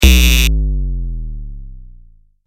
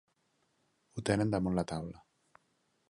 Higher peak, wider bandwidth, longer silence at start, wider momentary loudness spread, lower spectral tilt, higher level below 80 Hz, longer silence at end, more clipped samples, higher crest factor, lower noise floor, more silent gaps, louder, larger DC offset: first, 0 dBFS vs -14 dBFS; first, 17 kHz vs 11.5 kHz; second, 0 s vs 0.95 s; first, 23 LU vs 15 LU; second, -3.5 dB/octave vs -6.5 dB/octave; first, -14 dBFS vs -58 dBFS; second, 0.55 s vs 0.95 s; neither; second, 14 dB vs 22 dB; second, -44 dBFS vs -76 dBFS; neither; first, -15 LUFS vs -34 LUFS; neither